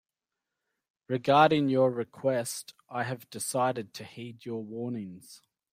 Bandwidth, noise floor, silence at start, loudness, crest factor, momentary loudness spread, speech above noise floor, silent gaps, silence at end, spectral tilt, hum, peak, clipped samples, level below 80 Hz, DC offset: 16 kHz; -89 dBFS; 1.1 s; -29 LUFS; 22 dB; 20 LU; 60 dB; none; 0.35 s; -5 dB/octave; none; -8 dBFS; under 0.1%; -72 dBFS; under 0.1%